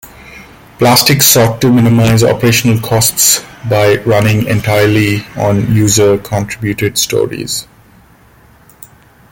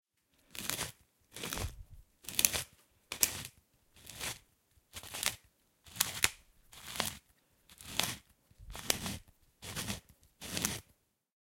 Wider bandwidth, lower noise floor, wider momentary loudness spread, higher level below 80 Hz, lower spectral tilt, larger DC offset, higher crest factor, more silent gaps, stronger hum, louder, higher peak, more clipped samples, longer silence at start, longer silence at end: about the same, 17.5 kHz vs 17 kHz; second, -43 dBFS vs -72 dBFS; second, 9 LU vs 21 LU; first, -40 dBFS vs -58 dBFS; first, -4 dB/octave vs -1 dB/octave; neither; second, 12 dB vs 38 dB; neither; neither; first, -10 LUFS vs -36 LUFS; about the same, 0 dBFS vs -2 dBFS; neither; second, 0.05 s vs 0.55 s; first, 1.7 s vs 0.6 s